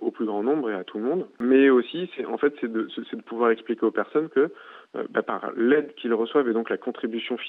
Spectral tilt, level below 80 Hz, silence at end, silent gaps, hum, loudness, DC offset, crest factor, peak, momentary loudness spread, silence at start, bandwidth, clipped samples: -8 dB/octave; -78 dBFS; 0 s; none; none; -25 LUFS; under 0.1%; 18 dB; -6 dBFS; 10 LU; 0 s; 4.1 kHz; under 0.1%